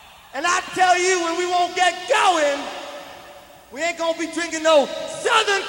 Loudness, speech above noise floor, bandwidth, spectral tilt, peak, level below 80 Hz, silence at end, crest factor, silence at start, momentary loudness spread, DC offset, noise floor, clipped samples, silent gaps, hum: -20 LUFS; 24 dB; 16 kHz; -1 dB/octave; -4 dBFS; -62 dBFS; 0 s; 18 dB; 0.35 s; 16 LU; under 0.1%; -43 dBFS; under 0.1%; none; none